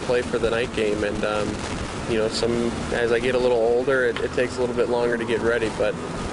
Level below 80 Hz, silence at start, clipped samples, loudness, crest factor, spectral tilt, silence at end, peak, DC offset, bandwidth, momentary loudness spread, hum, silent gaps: -40 dBFS; 0 s; under 0.1%; -23 LUFS; 14 dB; -5 dB/octave; 0 s; -10 dBFS; under 0.1%; 11 kHz; 5 LU; none; none